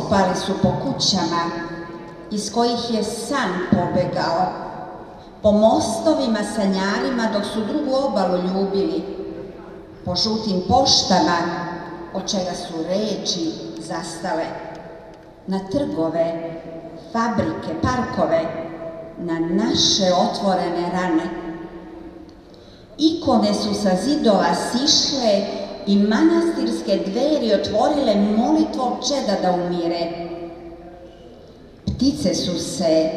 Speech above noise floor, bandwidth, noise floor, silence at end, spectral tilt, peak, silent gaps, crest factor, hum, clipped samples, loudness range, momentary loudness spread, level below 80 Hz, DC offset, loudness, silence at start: 24 dB; 12.5 kHz; -43 dBFS; 0 s; -4.5 dB/octave; -2 dBFS; none; 20 dB; none; under 0.1%; 7 LU; 17 LU; -48 dBFS; under 0.1%; -20 LUFS; 0 s